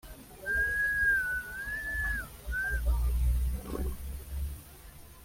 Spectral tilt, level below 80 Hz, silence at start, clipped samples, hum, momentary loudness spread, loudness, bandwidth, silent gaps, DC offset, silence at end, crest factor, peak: -5 dB/octave; -36 dBFS; 0.05 s; under 0.1%; none; 17 LU; -32 LUFS; 16.5 kHz; none; under 0.1%; 0 s; 12 dB; -20 dBFS